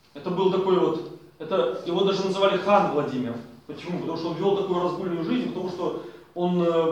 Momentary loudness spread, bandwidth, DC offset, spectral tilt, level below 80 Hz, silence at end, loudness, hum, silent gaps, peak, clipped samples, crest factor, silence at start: 14 LU; 9.4 kHz; under 0.1%; -7 dB/octave; -66 dBFS; 0 s; -25 LUFS; none; none; -4 dBFS; under 0.1%; 20 dB; 0.15 s